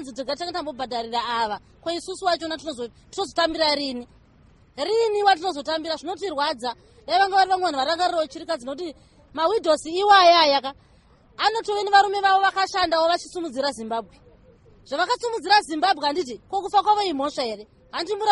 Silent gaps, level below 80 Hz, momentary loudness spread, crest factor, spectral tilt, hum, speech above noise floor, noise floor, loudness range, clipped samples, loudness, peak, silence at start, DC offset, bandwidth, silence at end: none; -58 dBFS; 13 LU; 20 dB; -2 dB/octave; none; 32 dB; -55 dBFS; 7 LU; under 0.1%; -22 LUFS; -4 dBFS; 0 s; under 0.1%; 11.5 kHz; 0 s